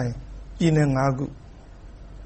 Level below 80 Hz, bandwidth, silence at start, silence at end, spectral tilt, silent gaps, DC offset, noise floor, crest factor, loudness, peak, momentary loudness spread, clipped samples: -42 dBFS; 8.6 kHz; 0 s; 0 s; -7.5 dB/octave; none; under 0.1%; -43 dBFS; 18 dB; -23 LUFS; -8 dBFS; 24 LU; under 0.1%